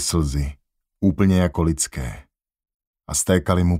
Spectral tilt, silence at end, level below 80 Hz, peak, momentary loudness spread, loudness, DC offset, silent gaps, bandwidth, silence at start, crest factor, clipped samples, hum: -5.5 dB/octave; 0 s; -34 dBFS; -2 dBFS; 13 LU; -21 LUFS; under 0.1%; 2.74-2.79 s, 2.87-2.94 s; 16 kHz; 0 s; 20 dB; under 0.1%; none